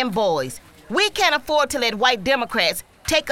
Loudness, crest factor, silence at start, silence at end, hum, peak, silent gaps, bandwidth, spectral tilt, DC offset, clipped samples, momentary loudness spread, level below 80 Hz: -20 LUFS; 18 dB; 0 s; 0 s; none; -2 dBFS; none; 17.5 kHz; -2.5 dB/octave; 0.4%; under 0.1%; 9 LU; -48 dBFS